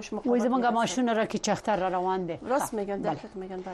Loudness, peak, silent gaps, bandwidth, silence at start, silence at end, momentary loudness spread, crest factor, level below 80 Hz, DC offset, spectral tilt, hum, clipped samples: -28 LUFS; -14 dBFS; none; 12.5 kHz; 0 s; 0 s; 7 LU; 14 dB; -58 dBFS; under 0.1%; -4.5 dB/octave; none; under 0.1%